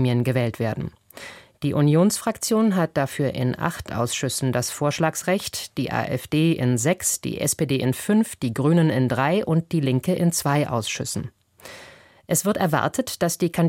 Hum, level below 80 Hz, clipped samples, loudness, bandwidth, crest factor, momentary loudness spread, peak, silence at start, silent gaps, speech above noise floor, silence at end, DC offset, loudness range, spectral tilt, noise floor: none; -54 dBFS; under 0.1%; -22 LUFS; 16.5 kHz; 16 dB; 10 LU; -6 dBFS; 0 s; none; 26 dB; 0 s; under 0.1%; 3 LU; -5 dB/octave; -47 dBFS